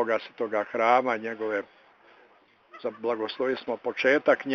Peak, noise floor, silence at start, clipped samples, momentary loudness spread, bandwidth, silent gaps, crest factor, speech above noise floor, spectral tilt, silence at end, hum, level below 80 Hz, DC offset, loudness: -8 dBFS; -60 dBFS; 0 s; under 0.1%; 10 LU; 6.8 kHz; none; 20 dB; 33 dB; -1.5 dB/octave; 0 s; none; -80 dBFS; under 0.1%; -27 LUFS